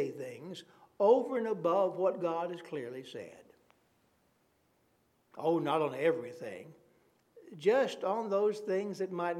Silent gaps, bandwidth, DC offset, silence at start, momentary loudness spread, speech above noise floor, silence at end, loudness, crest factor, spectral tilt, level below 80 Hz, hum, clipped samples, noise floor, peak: none; 13.5 kHz; under 0.1%; 0 s; 17 LU; 41 dB; 0 s; -32 LUFS; 20 dB; -6 dB/octave; -86 dBFS; none; under 0.1%; -73 dBFS; -14 dBFS